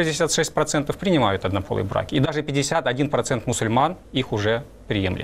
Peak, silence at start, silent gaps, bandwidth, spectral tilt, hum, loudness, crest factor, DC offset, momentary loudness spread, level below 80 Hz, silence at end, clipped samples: -8 dBFS; 0 s; none; 16 kHz; -4.5 dB/octave; none; -22 LUFS; 14 dB; under 0.1%; 5 LU; -46 dBFS; 0 s; under 0.1%